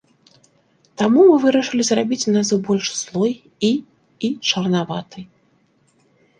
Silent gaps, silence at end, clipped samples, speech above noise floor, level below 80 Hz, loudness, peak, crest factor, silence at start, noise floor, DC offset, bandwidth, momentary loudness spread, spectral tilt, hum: none; 1.15 s; under 0.1%; 42 dB; -62 dBFS; -18 LUFS; -2 dBFS; 18 dB; 1 s; -60 dBFS; under 0.1%; 10 kHz; 14 LU; -4.5 dB/octave; none